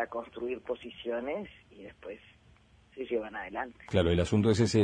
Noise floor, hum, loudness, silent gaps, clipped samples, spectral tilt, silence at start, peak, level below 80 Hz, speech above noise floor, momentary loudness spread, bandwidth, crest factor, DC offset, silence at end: -61 dBFS; none; -32 LUFS; none; under 0.1%; -6.5 dB/octave; 0 s; -12 dBFS; -52 dBFS; 30 dB; 21 LU; 10.5 kHz; 20 dB; under 0.1%; 0 s